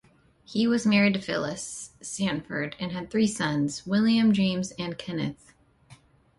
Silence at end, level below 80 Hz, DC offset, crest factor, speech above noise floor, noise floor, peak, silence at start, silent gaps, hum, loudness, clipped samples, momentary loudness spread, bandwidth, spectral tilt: 0.45 s; -60 dBFS; under 0.1%; 16 dB; 29 dB; -55 dBFS; -10 dBFS; 0.5 s; none; none; -26 LUFS; under 0.1%; 13 LU; 11.5 kHz; -5 dB/octave